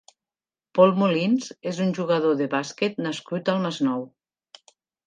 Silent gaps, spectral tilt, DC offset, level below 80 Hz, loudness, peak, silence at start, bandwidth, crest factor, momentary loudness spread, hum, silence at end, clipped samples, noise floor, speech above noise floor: none; -6 dB/octave; under 0.1%; -76 dBFS; -24 LUFS; -2 dBFS; 0.75 s; 9.4 kHz; 22 dB; 11 LU; none; 1 s; under 0.1%; under -90 dBFS; over 67 dB